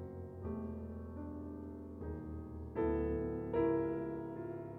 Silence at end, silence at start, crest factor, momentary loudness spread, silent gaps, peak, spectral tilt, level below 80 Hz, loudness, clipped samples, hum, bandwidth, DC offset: 0 s; 0 s; 16 dB; 12 LU; none; -24 dBFS; -11 dB/octave; -52 dBFS; -41 LUFS; under 0.1%; none; 3.9 kHz; under 0.1%